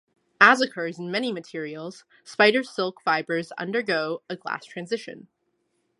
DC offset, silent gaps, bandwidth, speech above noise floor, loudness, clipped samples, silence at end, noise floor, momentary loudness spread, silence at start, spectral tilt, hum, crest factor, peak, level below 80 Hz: under 0.1%; none; 11.5 kHz; 48 dB; -24 LUFS; under 0.1%; 0.8 s; -73 dBFS; 17 LU; 0.4 s; -4 dB/octave; none; 26 dB; 0 dBFS; -80 dBFS